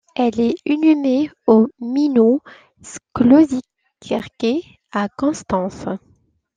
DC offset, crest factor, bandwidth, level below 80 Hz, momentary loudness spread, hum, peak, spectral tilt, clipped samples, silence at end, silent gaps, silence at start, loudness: under 0.1%; 16 dB; 9.4 kHz; -54 dBFS; 14 LU; none; -2 dBFS; -6.5 dB/octave; under 0.1%; 0.6 s; none; 0.2 s; -18 LUFS